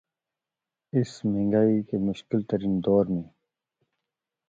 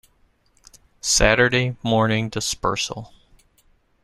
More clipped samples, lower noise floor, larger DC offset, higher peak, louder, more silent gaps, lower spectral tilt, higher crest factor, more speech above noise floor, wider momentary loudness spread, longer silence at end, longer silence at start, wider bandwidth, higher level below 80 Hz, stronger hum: neither; first, -89 dBFS vs -61 dBFS; neither; second, -10 dBFS vs -2 dBFS; second, -26 LUFS vs -20 LUFS; neither; first, -8.5 dB/octave vs -3.5 dB/octave; about the same, 18 dB vs 22 dB; first, 64 dB vs 41 dB; second, 7 LU vs 12 LU; first, 1.25 s vs 0.95 s; about the same, 0.95 s vs 1.05 s; second, 7.8 kHz vs 13.5 kHz; second, -58 dBFS vs -36 dBFS; neither